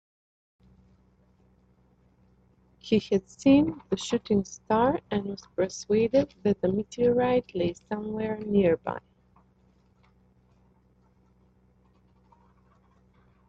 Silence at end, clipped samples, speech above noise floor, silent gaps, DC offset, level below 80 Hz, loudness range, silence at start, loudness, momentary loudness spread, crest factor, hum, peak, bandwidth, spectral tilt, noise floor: 4.5 s; under 0.1%; 37 dB; none; under 0.1%; -58 dBFS; 6 LU; 2.85 s; -27 LUFS; 10 LU; 20 dB; none; -10 dBFS; 8.2 kHz; -6.5 dB/octave; -63 dBFS